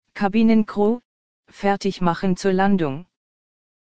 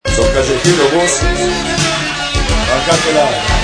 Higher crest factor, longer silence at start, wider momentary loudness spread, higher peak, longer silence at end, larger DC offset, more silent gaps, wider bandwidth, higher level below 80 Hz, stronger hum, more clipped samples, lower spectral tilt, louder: first, 18 dB vs 12 dB; about the same, 0 s vs 0.05 s; first, 9 LU vs 4 LU; second, -4 dBFS vs 0 dBFS; first, 0.65 s vs 0 s; first, 2% vs under 0.1%; first, 1.05-1.43 s vs none; second, 8.8 kHz vs 11 kHz; second, -48 dBFS vs -22 dBFS; neither; neither; first, -7 dB/octave vs -3.5 dB/octave; second, -21 LUFS vs -12 LUFS